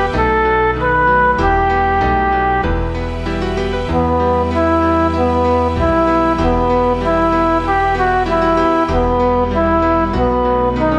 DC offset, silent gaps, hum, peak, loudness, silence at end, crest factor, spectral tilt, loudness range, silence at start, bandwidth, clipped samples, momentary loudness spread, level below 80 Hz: under 0.1%; none; none; -2 dBFS; -15 LUFS; 0 s; 12 dB; -7.5 dB/octave; 2 LU; 0 s; 9.6 kHz; under 0.1%; 4 LU; -24 dBFS